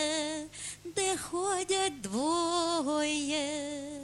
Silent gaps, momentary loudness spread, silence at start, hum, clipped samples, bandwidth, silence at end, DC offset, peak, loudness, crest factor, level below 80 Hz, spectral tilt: none; 8 LU; 0 s; none; under 0.1%; 13.5 kHz; 0 s; under 0.1%; -18 dBFS; -32 LUFS; 14 dB; -64 dBFS; -2 dB/octave